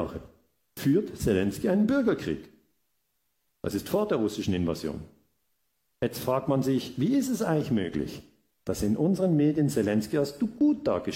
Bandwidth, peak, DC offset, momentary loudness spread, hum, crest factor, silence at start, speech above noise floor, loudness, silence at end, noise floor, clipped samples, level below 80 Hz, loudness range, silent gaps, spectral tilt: 16.5 kHz; -12 dBFS; under 0.1%; 12 LU; none; 16 dB; 0 s; 51 dB; -27 LUFS; 0 s; -77 dBFS; under 0.1%; -54 dBFS; 5 LU; none; -6.5 dB/octave